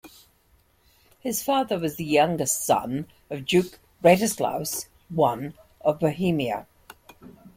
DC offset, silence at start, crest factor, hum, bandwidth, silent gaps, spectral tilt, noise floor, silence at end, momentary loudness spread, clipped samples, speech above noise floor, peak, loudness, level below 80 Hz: under 0.1%; 0.05 s; 20 dB; none; 16.5 kHz; none; -4.5 dB/octave; -62 dBFS; 0.1 s; 13 LU; under 0.1%; 39 dB; -4 dBFS; -24 LUFS; -58 dBFS